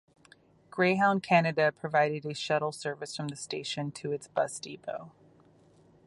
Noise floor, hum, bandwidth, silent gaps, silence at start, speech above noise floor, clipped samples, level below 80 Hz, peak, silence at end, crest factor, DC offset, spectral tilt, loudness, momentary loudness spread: -61 dBFS; none; 11.5 kHz; none; 0.75 s; 31 dB; under 0.1%; -74 dBFS; -10 dBFS; 0.95 s; 22 dB; under 0.1%; -5 dB/octave; -30 LUFS; 14 LU